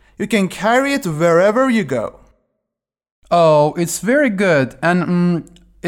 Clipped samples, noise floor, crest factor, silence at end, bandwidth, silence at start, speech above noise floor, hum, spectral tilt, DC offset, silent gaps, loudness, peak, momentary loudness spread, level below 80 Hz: under 0.1%; -83 dBFS; 14 dB; 0 s; 17 kHz; 0.2 s; 68 dB; none; -5.5 dB/octave; under 0.1%; 3.11-3.22 s; -15 LUFS; -4 dBFS; 7 LU; -52 dBFS